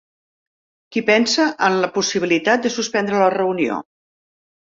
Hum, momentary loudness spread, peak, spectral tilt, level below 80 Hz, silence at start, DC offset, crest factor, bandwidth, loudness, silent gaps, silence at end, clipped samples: none; 7 LU; -2 dBFS; -3.5 dB/octave; -64 dBFS; 0.9 s; under 0.1%; 18 dB; 7.8 kHz; -18 LUFS; none; 0.9 s; under 0.1%